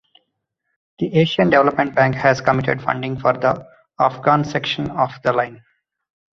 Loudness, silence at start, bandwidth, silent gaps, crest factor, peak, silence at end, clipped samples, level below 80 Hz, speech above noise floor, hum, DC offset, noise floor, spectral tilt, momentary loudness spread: -18 LUFS; 1 s; 7.4 kHz; none; 18 dB; 0 dBFS; 0.8 s; under 0.1%; -52 dBFS; 57 dB; none; under 0.1%; -75 dBFS; -6.5 dB/octave; 8 LU